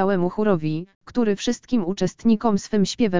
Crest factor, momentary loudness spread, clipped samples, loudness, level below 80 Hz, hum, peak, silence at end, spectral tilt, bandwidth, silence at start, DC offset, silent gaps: 14 dB; 6 LU; under 0.1%; -22 LUFS; -50 dBFS; none; -6 dBFS; 0 s; -6 dB/octave; 7.6 kHz; 0 s; 1%; 0.95-1.01 s